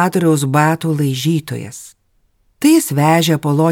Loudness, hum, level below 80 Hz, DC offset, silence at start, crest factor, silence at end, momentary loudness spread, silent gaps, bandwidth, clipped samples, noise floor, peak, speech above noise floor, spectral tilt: -14 LUFS; none; -60 dBFS; under 0.1%; 0 s; 14 dB; 0 s; 14 LU; none; 19 kHz; under 0.1%; -59 dBFS; 0 dBFS; 45 dB; -5.5 dB/octave